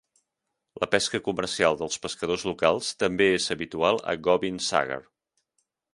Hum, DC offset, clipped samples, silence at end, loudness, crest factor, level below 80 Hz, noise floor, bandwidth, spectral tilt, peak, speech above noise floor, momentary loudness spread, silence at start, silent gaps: none; under 0.1%; under 0.1%; 0.95 s; -25 LUFS; 24 dB; -58 dBFS; -83 dBFS; 11.5 kHz; -3.5 dB/octave; -2 dBFS; 57 dB; 7 LU; 0.75 s; none